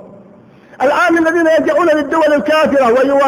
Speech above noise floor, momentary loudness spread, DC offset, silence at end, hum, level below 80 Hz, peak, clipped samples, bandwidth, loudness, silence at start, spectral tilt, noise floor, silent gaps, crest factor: 30 dB; 2 LU; under 0.1%; 0 s; none; -52 dBFS; -2 dBFS; under 0.1%; over 20 kHz; -12 LUFS; 0.05 s; -4.5 dB/octave; -41 dBFS; none; 10 dB